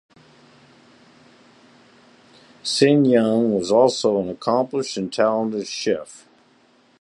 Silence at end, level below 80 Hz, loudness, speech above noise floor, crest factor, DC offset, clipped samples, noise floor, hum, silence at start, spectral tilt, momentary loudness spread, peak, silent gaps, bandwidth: 0.85 s; -64 dBFS; -20 LUFS; 38 dB; 20 dB; under 0.1%; under 0.1%; -57 dBFS; none; 2.65 s; -5 dB/octave; 10 LU; -2 dBFS; none; 11.5 kHz